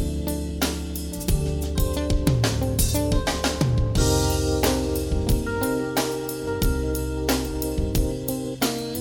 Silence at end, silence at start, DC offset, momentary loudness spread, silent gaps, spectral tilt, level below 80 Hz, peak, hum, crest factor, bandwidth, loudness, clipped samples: 0 s; 0 s; under 0.1%; 6 LU; none; -5 dB/octave; -28 dBFS; -6 dBFS; none; 18 dB; 18.5 kHz; -24 LUFS; under 0.1%